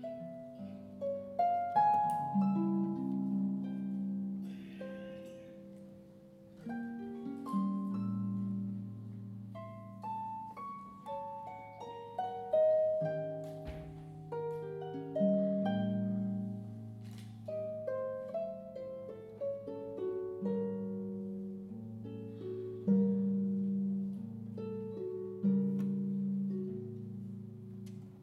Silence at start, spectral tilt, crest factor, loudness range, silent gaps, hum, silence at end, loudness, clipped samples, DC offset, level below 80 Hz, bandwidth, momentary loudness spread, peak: 0 s; -9.5 dB/octave; 18 dB; 9 LU; none; none; 0 s; -37 LUFS; under 0.1%; under 0.1%; -68 dBFS; 5 kHz; 16 LU; -20 dBFS